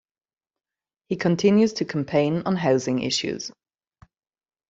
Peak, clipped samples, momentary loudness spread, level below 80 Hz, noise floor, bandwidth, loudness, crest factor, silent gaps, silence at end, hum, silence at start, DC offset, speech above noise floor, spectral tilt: -6 dBFS; under 0.1%; 12 LU; -64 dBFS; under -90 dBFS; 8 kHz; -23 LUFS; 18 dB; none; 1.2 s; none; 1.1 s; under 0.1%; over 68 dB; -5.5 dB/octave